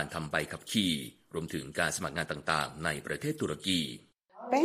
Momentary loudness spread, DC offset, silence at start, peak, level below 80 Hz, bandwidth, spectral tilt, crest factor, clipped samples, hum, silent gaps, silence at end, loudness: 9 LU; under 0.1%; 0 s; -10 dBFS; -60 dBFS; 15.5 kHz; -3.5 dB/octave; 22 dB; under 0.1%; none; none; 0 s; -33 LUFS